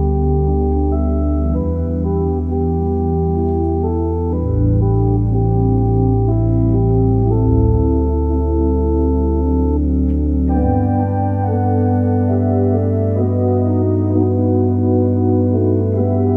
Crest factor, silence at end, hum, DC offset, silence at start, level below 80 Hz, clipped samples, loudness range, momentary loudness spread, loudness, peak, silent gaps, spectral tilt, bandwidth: 12 dB; 0 s; none; under 0.1%; 0 s; -22 dBFS; under 0.1%; 3 LU; 3 LU; -16 LUFS; -2 dBFS; none; -13.5 dB/octave; 2.4 kHz